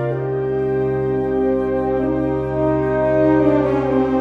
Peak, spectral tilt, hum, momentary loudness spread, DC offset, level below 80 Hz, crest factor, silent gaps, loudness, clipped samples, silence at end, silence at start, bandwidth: -4 dBFS; -10 dB/octave; none; 5 LU; under 0.1%; -38 dBFS; 14 dB; none; -18 LUFS; under 0.1%; 0 s; 0 s; 5 kHz